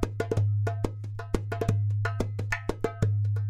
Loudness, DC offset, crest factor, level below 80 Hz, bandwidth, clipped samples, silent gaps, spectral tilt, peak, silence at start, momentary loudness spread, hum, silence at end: -30 LUFS; under 0.1%; 18 dB; -42 dBFS; 11 kHz; under 0.1%; none; -7.5 dB/octave; -10 dBFS; 0 s; 6 LU; none; 0 s